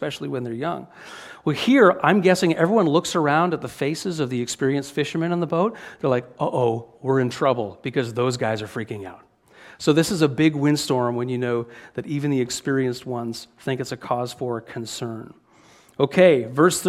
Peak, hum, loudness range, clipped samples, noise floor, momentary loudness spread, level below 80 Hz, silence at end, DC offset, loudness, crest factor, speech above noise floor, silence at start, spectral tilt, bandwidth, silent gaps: -2 dBFS; none; 7 LU; under 0.1%; -53 dBFS; 14 LU; -62 dBFS; 0 s; under 0.1%; -22 LUFS; 20 dB; 31 dB; 0 s; -5.5 dB/octave; 15.5 kHz; none